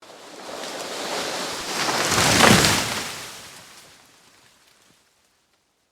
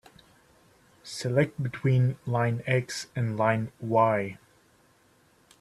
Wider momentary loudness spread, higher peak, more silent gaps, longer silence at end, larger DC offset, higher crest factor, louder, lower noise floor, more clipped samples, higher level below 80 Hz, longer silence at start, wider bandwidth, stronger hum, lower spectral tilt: first, 25 LU vs 10 LU; first, -2 dBFS vs -8 dBFS; neither; first, 2.1 s vs 1.25 s; neither; about the same, 24 dB vs 20 dB; first, -20 LUFS vs -27 LUFS; first, -67 dBFS vs -63 dBFS; neither; first, -48 dBFS vs -64 dBFS; second, 0 s vs 1.05 s; first, over 20 kHz vs 12.5 kHz; neither; second, -2.5 dB/octave vs -6.5 dB/octave